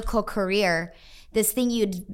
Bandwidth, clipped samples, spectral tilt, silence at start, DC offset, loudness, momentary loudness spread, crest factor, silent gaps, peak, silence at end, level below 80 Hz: 17 kHz; under 0.1%; -4 dB/octave; 0 s; under 0.1%; -24 LUFS; 6 LU; 16 dB; none; -10 dBFS; 0 s; -40 dBFS